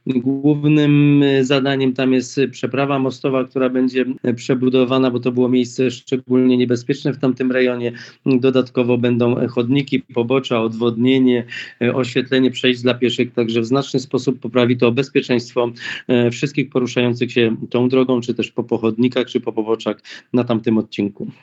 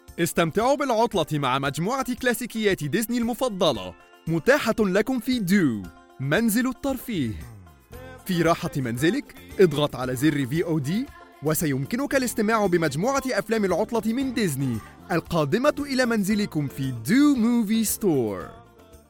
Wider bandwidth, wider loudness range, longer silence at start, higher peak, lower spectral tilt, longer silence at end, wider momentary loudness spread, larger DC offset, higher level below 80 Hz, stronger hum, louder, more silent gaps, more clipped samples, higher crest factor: second, 8 kHz vs 17.5 kHz; about the same, 2 LU vs 2 LU; about the same, 0.05 s vs 0.1 s; first, -2 dBFS vs -6 dBFS; first, -6.5 dB/octave vs -5 dB/octave; about the same, 0.1 s vs 0.15 s; second, 7 LU vs 10 LU; neither; second, -72 dBFS vs -50 dBFS; neither; first, -18 LUFS vs -24 LUFS; neither; neither; about the same, 16 dB vs 18 dB